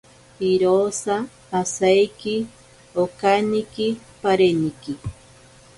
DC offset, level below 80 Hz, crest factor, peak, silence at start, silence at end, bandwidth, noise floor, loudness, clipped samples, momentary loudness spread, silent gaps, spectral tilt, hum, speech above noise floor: under 0.1%; -52 dBFS; 18 dB; -4 dBFS; 0.4 s; 0.65 s; 11.5 kHz; -49 dBFS; -21 LUFS; under 0.1%; 13 LU; none; -5 dB/octave; none; 28 dB